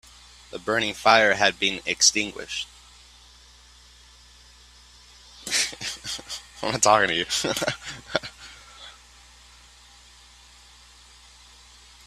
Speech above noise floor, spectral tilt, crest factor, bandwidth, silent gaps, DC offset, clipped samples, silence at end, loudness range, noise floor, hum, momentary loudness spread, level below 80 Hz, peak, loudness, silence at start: 29 dB; -1 dB/octave; 28 dB; 15.5 kHz; none; under 0.1%; under 0.1%; 3.15 s; 15 LU; -52 dBFS; 60 Hz at -55 dBFS; 22 LU; -56 dBFS; 0 dBFS; -22 LUFS; 0.55 s